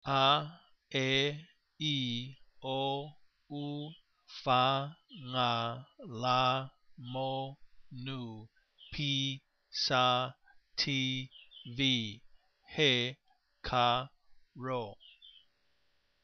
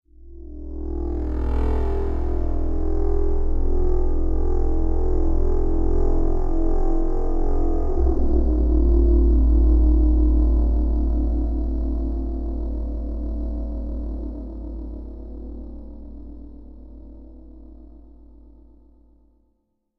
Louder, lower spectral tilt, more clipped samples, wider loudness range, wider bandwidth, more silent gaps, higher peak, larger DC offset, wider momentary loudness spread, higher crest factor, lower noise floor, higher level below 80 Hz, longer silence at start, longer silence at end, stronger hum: second, -33 LUFS vs -24 LUFS; second, -4.5 dB/octave vs -11.5 dB/octave; neither; second, 4 LU vs 18 LU; first, 6.8 kHz vs 2 kHz; neither; second, -14 dBFS vs -8 dBFS; neither; about the same, 19 LU vs 21 LU; first, 22 dB vs 12 dB; first, -75 dBFS vs -70 dBFS; second, -64 dBFS vs -20 dBFS; second, 0.05 s vs 0.2 s; second, 0.95 s vs 2 s; neither